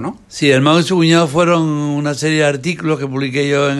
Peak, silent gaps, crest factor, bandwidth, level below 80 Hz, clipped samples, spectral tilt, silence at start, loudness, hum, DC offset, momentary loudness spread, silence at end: -2 dBFS; none; 14 dB; 12.5 kHz; -54 dBFS; under 0.1%; -5.5 dB/octave; 0 s; -14 LUFS; none; under 0.1%; 7 LU; 0 s